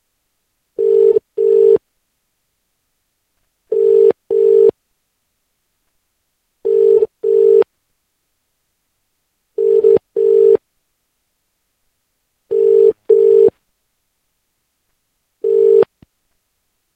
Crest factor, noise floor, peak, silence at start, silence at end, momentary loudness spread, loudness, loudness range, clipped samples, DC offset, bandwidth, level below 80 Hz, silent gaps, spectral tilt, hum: 16 dB; -69 dBFS; 0 dBFS; 0.8 s; 1.1 s; 9 LU; -13 LUFS; 1 LU; under 0.1%; under 0.1%; 3.5 kHz; -62 dBFS; none; -8 dB/octave; none